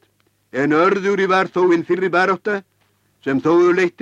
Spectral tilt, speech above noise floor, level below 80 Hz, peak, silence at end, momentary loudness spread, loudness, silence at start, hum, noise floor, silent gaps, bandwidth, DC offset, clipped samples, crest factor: -6.5 dB/octave; 46 dB; -64 dBFS; -4 dBFS; 0.1 s; 10 LU; -17 LUFS; 0.55 s; none; -62 dBFS; none; 8 kHz; under 0.1%; under 0.1%; 14 dB